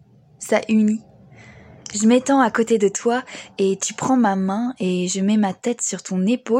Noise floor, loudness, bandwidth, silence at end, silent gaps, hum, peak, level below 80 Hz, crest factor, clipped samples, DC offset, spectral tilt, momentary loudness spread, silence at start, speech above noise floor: -45 dBFS; -20 LUFS; 12.5 kHz; 0 s; none; none; -4 dBFS; -64 dBFS; 16 dB; under 0.1%; under 0.1%; -5 dB/octave; 7 LU; 0.4 s; 26 dB